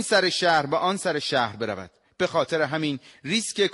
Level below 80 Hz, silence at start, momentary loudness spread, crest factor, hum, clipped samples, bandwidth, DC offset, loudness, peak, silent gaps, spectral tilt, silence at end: -66 dBFS; 0 s; 10 LU; 16 dB; none; under 0.1%; 11.5 kHz; under 0.1%; -24 LUFS; -8 dBFS; none; -3.5 dB/octave; 0 s